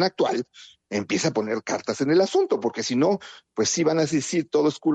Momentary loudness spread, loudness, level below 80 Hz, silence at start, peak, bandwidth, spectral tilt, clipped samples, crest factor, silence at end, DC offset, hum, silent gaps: 9 LU; -24 LUFS; -68 dBFS; 0 s; -10 dBFS; 9.2 kHz; -4.5 dB/octave; under 0.1%; 14 dB; 0 s; under 0.1%; none; none